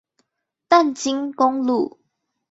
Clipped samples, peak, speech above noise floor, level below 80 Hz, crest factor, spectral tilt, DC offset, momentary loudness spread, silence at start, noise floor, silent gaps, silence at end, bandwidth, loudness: under 0.1%; -2 dBFS; 53 dB; -68 dBFS; 18 dB; -3 dB/octave; under 0.1%; 7 LU; 0.7 s; -74 dBFS; none; 0.65 s; 8 kHz; -20 LUFS